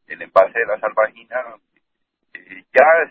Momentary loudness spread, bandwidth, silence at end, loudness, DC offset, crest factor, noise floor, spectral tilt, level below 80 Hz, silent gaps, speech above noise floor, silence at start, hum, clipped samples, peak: 23 LU; 8 kHz; 0.05 s; -17 LUFS; under 0.1%; 18 dB; -73 dBFS; -5 dB/octave; -66 dBFS; none; 55 dB; 0.1 s; none; under 0.1%; 0 dBFS